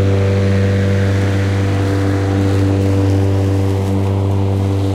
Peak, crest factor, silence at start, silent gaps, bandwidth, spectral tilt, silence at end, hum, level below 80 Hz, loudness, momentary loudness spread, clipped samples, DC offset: -4 dBFS; 10 dB; 0 s; none; 10.5 kHz; -7.5 dB/octave; 0 s; none; -40 dBFS; -15 LUFS; 2 LU; under 0.1%; under 0.1%